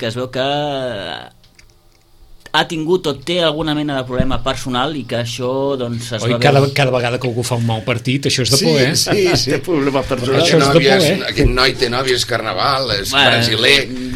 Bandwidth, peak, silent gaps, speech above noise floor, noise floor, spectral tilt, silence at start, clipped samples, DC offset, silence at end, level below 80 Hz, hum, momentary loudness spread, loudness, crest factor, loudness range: 16 kHz; 0 dBFS; none; 33 dB; -49 dBFS; -4 dB/octave; 0 s; under 0.1%; under 0.1%; 0 s; -34 dBFS; none; 9 LU; -15 LUFS; 16 dB; 6 LU